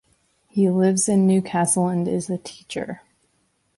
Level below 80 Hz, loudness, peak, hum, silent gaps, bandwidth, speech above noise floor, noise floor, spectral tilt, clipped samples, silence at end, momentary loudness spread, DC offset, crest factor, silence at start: -62 dBFS; -21 LUFS; -6 dBFS; none; none; 11.5 kHz; 47 dB; -67 dBFS; -5.5 dB/octave; under 0.1%; 0.8 s; 13 LU; under 0.1%; 16 dB; 0.55 s